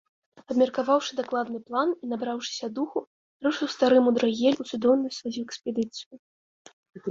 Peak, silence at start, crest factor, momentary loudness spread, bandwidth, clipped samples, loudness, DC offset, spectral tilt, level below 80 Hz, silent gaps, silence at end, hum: -8 dBFS; 0.5 s; 18 dB; 12 LU; 7.6 kHz; under 0.1%; -26 LUFS; under 0.1%; -4.5 dB/octave; -72 dBFS; 3.07-3.40 s, 6.06-6.11 s, 6.19-6.65 s, 6.73-6.83 s; 0 s; none